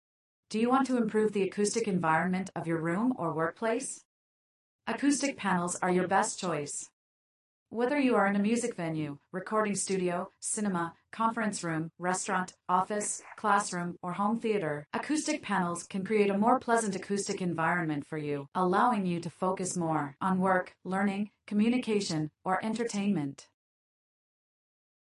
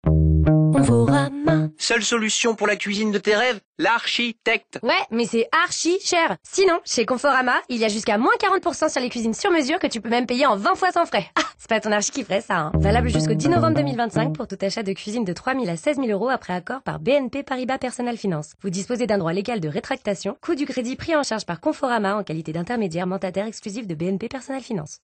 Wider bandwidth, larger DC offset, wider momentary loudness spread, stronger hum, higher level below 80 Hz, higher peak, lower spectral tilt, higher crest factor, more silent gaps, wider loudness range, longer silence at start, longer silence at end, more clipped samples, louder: first, 11.5 kHz vs 9.6 kHz; neither; about the same, 8 LU vs 8 LU; neither; second, -74 dBFS vs -38 dBFS; second, -12 dBFS vs -8 dBFS; about the same, -5 dB/octave vs -5 dB/octave; first, 20 dB vs 14 dB; first, 4.05-4.79 s, 6.93-7.66 s, 18.48-18.52 s vs 3.65-3.73 s; second, 2 LU vs 5 LU; first, 0.5 s vs 0.05 s; first, 1.65 s vs 0.1 s; neither; second, -31 LUFS vs -22 LUFS